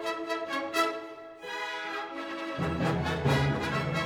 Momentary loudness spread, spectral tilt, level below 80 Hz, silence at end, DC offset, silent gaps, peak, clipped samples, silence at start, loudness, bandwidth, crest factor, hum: 10 LU; -5.5 dB/octave; -50 dBFS; 0 s; under 0.1%; none; -12 dBFS; under 0.1%; 0 s; -31 LUFS; 19 kHz; 20 dB; none